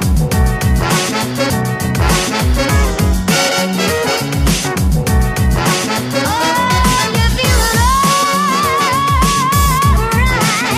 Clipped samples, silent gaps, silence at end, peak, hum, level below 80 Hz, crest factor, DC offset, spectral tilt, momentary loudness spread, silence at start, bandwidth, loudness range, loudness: under 0.1%; none; 0 s; 0 dBFS; none; -20 dBFS; 12 dB; under 0.1%; -4 dB/octave; 4 LU; 0 s; 15.5 kHz; 2 LU; -13 LUFS